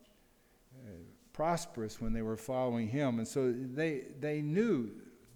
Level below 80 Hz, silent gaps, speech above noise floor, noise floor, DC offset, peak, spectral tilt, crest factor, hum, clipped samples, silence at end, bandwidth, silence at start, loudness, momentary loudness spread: -52 dBFS; none; 33 dB; -67 dBFS; under 0.1%; -20 dBFS; -6.5 dB/octave; 16 dB; none; under 0.1%; 0.2 s; 19.5 kHz; 0.7 s; -35 LUFS; 20 LU